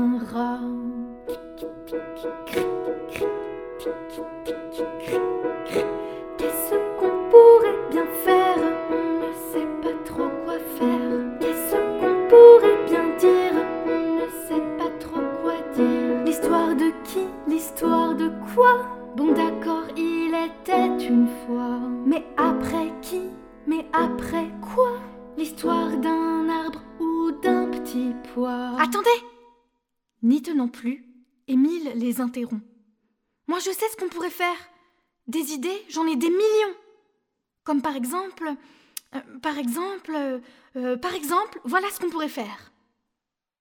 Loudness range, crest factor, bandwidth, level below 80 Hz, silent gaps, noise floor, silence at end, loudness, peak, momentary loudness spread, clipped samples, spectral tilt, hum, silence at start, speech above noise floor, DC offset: 13 LU; 22 dB; 20 kHz; -56 dBFS; none; -85 dBFS; 1.05 s; -22 LUFS; 0 dBFS; 14 LU; under 0.1%; -4.5 dB/octave; none; 0 s; 58 dB; under 0.1%